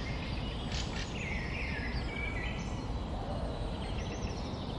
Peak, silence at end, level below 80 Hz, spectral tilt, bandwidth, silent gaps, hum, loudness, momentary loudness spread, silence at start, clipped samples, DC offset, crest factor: -22 dBFS; 0 s; -40 dBFS; -5.5 dB/octave; 11 kHz; none; none; -37 LUFS; 3 LU; 0 s; under 0.1%; under 0.1%; 14 dB